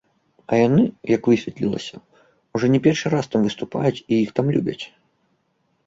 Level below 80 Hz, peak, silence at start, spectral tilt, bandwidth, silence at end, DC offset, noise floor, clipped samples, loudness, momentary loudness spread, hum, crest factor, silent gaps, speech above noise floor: -56 dBFS; -4 dBFS; 0.5 s; -7 dB/octave; 7.8 kHz; 1 s; under 0.1%; -68 dBFS; under 0.1%; -21 LUFS; 12 LU; none; 18 dB; none; 48 dB